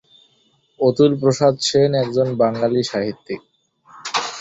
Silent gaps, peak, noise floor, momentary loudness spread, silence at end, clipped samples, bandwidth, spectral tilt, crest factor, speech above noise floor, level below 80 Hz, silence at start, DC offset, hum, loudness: none; -2 dBFS; -61 dBFS; 15 LU; 0 s; under 0.1%; 8.2 kHz; -5.5 dB/octave; 16 dB; 43 dB; -58 dBFS; 0.8 s; under 0.1%; none; -18 LUFS